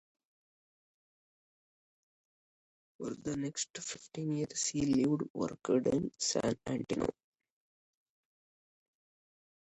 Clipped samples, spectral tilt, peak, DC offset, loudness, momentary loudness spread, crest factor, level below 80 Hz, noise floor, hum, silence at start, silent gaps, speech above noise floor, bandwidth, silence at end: under 0.1%; -4.5 dB/octave; -18 dBFS; under 0.1%; -35 LUFS; 10 LU; 20 dB; -66 dBFS; under -90 dBFS; none; 3 s; 3.70-3.74 s, 5.30-5.34 s; over 56 dB; 11 kHz; 2.6 s